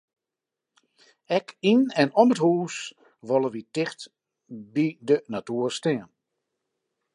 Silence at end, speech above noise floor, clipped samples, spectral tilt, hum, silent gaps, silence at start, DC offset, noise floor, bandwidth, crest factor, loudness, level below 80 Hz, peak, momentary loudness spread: 1.1 s; 64 dB; under 0.1%; -5.5 dB/octave; none; none; 1.3 s; under 0.1%; -88 dBFS; 11 kHz; 22 dB; -25 LUFS; -78 dBFS; -4 dBFS; 20 LU